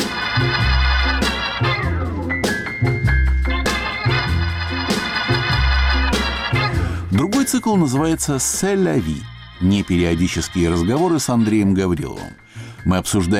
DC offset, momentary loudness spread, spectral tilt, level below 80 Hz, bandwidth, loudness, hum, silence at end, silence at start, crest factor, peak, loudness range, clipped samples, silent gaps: under 0.1%; 5 LU; -5 dB/octave; -26 dBFS; 16 kHz; -18 LUFS; none; 0 s; 0 s; 10 dB; -8 dBFS; 1 LU; under 0.1%; none